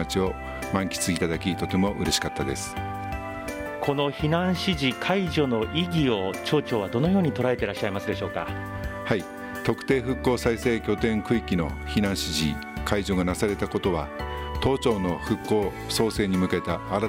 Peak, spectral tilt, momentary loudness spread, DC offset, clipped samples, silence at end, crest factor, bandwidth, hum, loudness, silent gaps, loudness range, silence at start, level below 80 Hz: -6 dBFS; -5 dB/octave; 8 LU; under 0.1%; under 0.1%; 0 s; 20 dB; 16.5 kHz; none; -26 LUFS; none; 2 LU; 0 s; -42 dBFS